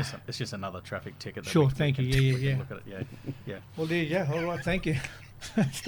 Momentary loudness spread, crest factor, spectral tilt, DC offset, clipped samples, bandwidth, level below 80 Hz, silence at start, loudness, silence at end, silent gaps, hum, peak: 15 LU; 18 dB; -6 dB/octave; under 0.1%; under 0.1%; 19 kHz; -48 dBFS; 0 s; -30 LUFS; 0 s; none; none; -12 dBFS